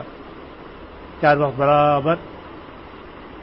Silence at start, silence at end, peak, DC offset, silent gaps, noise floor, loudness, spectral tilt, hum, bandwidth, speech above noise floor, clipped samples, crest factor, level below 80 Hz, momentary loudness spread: 0 s; 0 s; -4 dBFS; 0.1%; none; -39 dBFS; -18 LUFS; -11 dB/octave; none; 5.8 kHz; 22 dB; under 0.1%; 18 dB; -48 dBFS; 23 LU